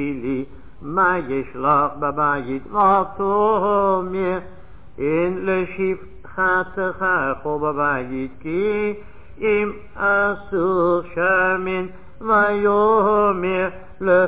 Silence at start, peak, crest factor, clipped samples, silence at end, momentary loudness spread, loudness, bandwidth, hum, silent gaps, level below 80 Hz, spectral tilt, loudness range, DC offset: 0 s; -6 dBFS; 14 dB; under 0.1%; 0 s; 10 LU; -20 LUFS; 4 kHz; none; none; -46 dBFS; -10 dB/octave; 4 LU; 1%